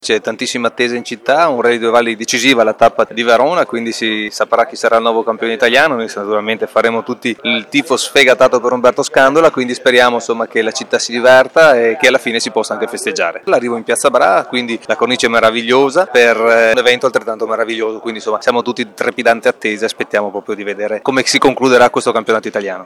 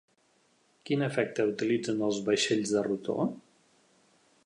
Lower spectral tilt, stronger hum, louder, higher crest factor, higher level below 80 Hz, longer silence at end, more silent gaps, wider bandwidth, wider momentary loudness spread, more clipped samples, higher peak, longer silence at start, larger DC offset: second, -3 dB/octave vs -4.5 dB/octave; neither; first, -12 LUFS vs -30 LUFS; second, 12 dB vs 18 dB; first, -54 dBFS vs -74 dBFS; second, 0 s vs 1.05 s; neither; first, 17 kHz vs 11 kHz; first, 9 LU vs 6 LU; neither; first, 0 dBFS vs -14 dBFS; second, 0.05 s vs 0.85 s; neither